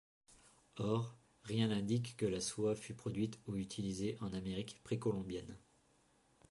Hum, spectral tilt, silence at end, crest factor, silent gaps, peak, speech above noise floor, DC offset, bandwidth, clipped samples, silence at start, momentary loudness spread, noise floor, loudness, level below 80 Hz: none; -6 dB/octave; 0.95 s; 18 dB; none; -24 dBFS; 33 dB; under 0.1%; 11.5 kHz; under 0.1%; 0.3 s; 10 LU; -73 dBFS; -41 LUFS; -66 dBFS